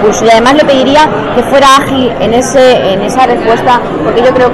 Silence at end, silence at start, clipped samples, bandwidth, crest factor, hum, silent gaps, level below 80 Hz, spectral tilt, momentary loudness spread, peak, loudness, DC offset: 0 s; 0 s; 0.2%; 14 kHz; 6 dB; none; none; -32 dBFS; -4 dB/octave; 5 LU; 0 dBFS; -6 LUFS; under 0.1%